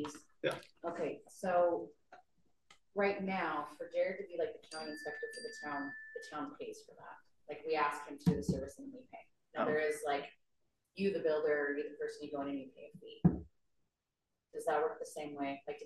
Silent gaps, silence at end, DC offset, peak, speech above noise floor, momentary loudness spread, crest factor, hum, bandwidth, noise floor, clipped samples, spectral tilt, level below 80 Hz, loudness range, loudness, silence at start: none; 0 s; under 0.1%; -16 dBFS; 51 dB; 18 LU; 24 dB; none; 12.5 kHz; -89 dBFS; under 0.1%; -6 dB/octave; -62 dBFS; 4 LU; -38 LUFS; 0 s